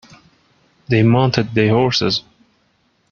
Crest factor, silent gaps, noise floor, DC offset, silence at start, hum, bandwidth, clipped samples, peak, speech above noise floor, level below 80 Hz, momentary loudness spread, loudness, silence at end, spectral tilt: 18 dB; none; -61 dBFS; under 0.1%; 0.9 s; none; 7 kHz; under 0.1%; 0 dBFS; 47 dB; -50 dBFS; 6 LU; -16 LUFS; 0.9 s; -6.5 dB/octave